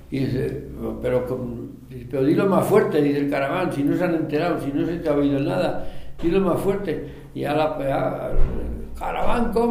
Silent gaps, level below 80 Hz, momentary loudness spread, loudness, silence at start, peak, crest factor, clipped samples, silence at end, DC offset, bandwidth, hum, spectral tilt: none; -32 dBFS; 12 LU; -23 LUFS; 0 s; -4 dBFS; 18 dB; under 0.1%; 0 s; under 0.1%; 15.5 kHz; none; -7.5 dB/octave